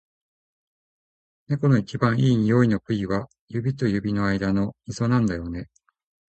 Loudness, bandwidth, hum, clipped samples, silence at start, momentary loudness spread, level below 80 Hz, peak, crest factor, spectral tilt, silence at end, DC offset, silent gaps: -23 LUFS; 8.6 kHz; none; under 0.1%; 1.5 s; 10 LU; -48 dBFS; -6 dBFS; 18 dB; -7.5 dB/octave; 0.75 s; under 0.1%; 3.41-3.48 s